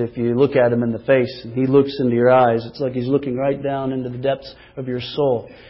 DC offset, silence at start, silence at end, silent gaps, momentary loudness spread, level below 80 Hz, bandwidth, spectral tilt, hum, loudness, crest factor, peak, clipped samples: under 0.1%; 0 s; 0 s; none; 10 LU; -52 dBFS; 5.8 kHz; -11.5 dB/octave; none; -19 LUFS; 16 dB; -4 dBFS; under 0.1%